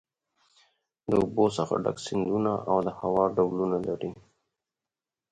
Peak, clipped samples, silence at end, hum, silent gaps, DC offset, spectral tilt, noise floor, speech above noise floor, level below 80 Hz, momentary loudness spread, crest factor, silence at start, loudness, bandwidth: -10 dBFS; under 0.1%; 1.15 s; none; none; under 0.1%; -7 dB/octave; under -90 dBFS; over 63 dB; -58 dBFS; 7 LU; 20 dB; 1.1 s; -27 LUFS; 9.6 kHz